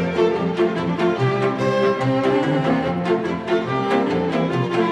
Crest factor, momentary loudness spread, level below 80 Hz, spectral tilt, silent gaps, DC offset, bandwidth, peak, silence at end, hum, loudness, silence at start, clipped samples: 12 dB; 2 LU; -56 dBFS; -7.5 dB/octave; none; under 0.1%; 10.5 kHz; -8 dBFS; 0 s; none; -20 LUFS; 0 s; under 0.1%